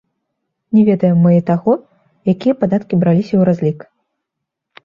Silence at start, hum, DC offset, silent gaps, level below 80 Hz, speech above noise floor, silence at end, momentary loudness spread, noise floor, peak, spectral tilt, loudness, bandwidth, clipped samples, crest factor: 0.7 s; none; under 0.1%; none; -54 dBFS; 65 dB; 1.05 s; 8 LU; -78 dBFS; -2 dBFS; -10.5 dB/octave; -14 LUFS; 5.6 kHz; under 0.1%; 14 dB